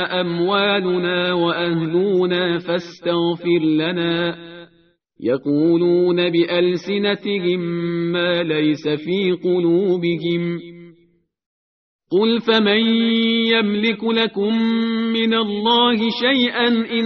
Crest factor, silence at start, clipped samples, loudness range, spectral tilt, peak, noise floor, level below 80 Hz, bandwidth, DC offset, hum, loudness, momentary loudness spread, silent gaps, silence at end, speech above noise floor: 16 dB; 0 s; under 0.1%; 4 LU; -3.5 dB/octave; -2 dBFS; -59 dBFS; -62 dBFS; 6.4 kHz; under 0.1%; none; -18 LUFS; 6 LU; 11.46-11.99 s; 0 s; 41 dB